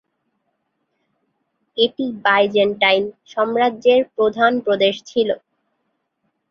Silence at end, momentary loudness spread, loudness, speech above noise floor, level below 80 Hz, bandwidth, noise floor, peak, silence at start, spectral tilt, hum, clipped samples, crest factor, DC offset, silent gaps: 1.15 s; 7 LU; -18 LUFS; 55 dB; -64 dBFS; 7 kHz; -72 dBFS; -2 dBFS; 1.75 s; -5 dB/octave; none; under 0.1%; 18 dB; under 0.1%; none